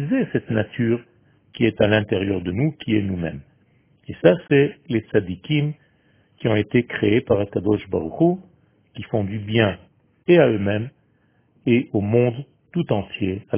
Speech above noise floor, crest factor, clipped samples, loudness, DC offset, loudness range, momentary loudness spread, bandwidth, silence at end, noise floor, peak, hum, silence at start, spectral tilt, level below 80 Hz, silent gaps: 41 dB; 20 dB; under 0.1%; -21 LUFS; under 0.1%; 2 LU; 11 LU; 3.6 kHz; 0 s; -62 dBFS; 0 dBFS; none; 0 s; -11.5 dB/octave; -48 dBFS; none